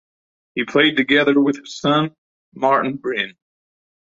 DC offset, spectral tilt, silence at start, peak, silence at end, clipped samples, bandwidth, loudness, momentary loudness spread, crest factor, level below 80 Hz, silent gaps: under 0.1%; -5 dB/octave; 0.55 s; -2 dBFS; 0.85 s; under 0.1%; 7.6 kHz; -18 LUFS; 12 LU; 18 dB; -62 dBFS; 2.18-2.52 s